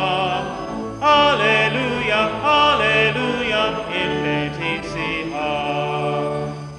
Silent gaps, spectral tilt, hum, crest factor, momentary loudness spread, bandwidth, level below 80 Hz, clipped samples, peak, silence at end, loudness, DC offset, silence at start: none; -5 dB/octave; none; 16 dB; 9 LU; 11.5 kHz; -46 dBFS; under 0.1%; -4 dBFS; 0 s; -19 LUFS; under 0.1%; 0 s